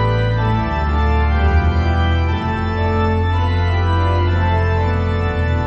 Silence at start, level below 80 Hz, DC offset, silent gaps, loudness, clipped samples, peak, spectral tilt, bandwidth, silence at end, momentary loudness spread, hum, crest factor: 0 s; -24 dBFS; under 0.1%; none; -17 LUFS; under 0.1%; -4 dBFS; -8 dB/octave; 6.2 kHz; 0 s; 3 LU; none; 12 dB